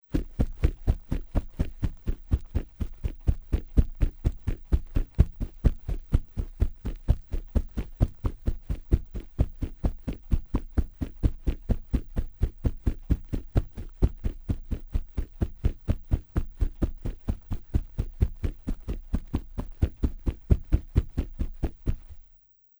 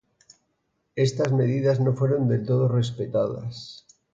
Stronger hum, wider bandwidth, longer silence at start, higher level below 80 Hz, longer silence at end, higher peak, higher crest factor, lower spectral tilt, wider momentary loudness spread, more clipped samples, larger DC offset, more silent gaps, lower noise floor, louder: neither; first, over 20 kHz vs 7.8 kHz; second, 0.1 s vs 0.95 s; first, -30 dBFS vs -60 dBFS; first, 0.6 s vs 0.35 s; first, -6 dBFS vs -10 dBFS; first, 22 dB vs 14 dB; first, -9 dB/octave vs -7.5 dB/octave; second, 9 LU vs 14 LU; neither; neither; neither; second, -58 dBFS vs -74 dBFS; second, -32 LUFS vs -24 LUFS